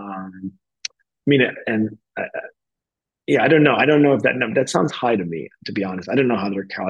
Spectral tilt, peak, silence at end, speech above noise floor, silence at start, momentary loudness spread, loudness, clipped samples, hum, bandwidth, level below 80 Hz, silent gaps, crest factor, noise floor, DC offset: -6 dB/octave; -2 dBFS; 0 s; 68 dB; 0 s; 18 LU; -19 LUFS; under 0.1%; none; 10 kHz; -68 dBFS; none; 18 dB; -87 dBFS; under 0.1%